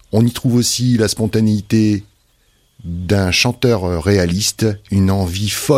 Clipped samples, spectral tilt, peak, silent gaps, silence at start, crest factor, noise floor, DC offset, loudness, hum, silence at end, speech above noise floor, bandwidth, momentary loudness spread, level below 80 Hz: under 0.1%; -5 dB/octave; 0 dBFS; none; 0.15 s; 14 dB; -57 dBFS; under 0.1%; -16 LUFS; none; 0 s; 42 dB; 16 kHz; 5 LU; -38 dBFS